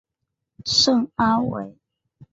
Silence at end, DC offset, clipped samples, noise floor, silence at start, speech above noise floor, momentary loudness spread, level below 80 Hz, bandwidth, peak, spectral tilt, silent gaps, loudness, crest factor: 0.1 s; under 0.1%; under 0.1%; -81 dBFS; 0.65 s; 60 dB; 16 LU; -54 dBFS; 8 kHz; -6 dBFS; -3.5 dB/octave; none; -19 LUFS; 18 dB